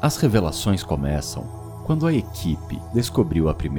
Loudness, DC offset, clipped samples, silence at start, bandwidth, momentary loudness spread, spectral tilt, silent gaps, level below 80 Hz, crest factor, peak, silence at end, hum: -23 LUFS; under 0.1%; under 0.1%; 0 s; 19.5 kHz; 10 LU; -6 dB/octave; none; -36 dBFS; 20 dB; -2 dBFS; 0 s; none